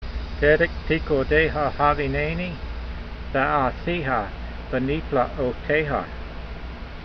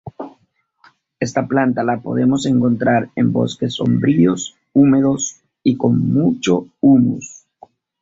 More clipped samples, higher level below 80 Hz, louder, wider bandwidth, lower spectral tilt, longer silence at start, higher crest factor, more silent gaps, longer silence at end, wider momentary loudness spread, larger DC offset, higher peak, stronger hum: neither; first, -34 dBFS vs -52 dBFS; second, -23 LUFS vs -16 LUFS; second, 6.2 kHz vs 7.8 kHz; first, -8 dB/octave vs -6 dB/octave; about the same, 0 s vs 0.05 s; first, 20 dB vs 14 dB; neither; second, 0 s vs 0.7 s; first, 16 LU vs 11 LU; neither; about the same, -4 dBFS vs -2 dBFS; neither